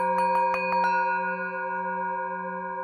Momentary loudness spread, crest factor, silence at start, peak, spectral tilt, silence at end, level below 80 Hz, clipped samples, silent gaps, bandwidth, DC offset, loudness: 8 LU; 14 dB; 0 s; -12 dBFS; -6 dB/octave; 0 s; -70 dBFS; under 0.1%; none; 11.5 kHz; under 0.1%; -27 LUFS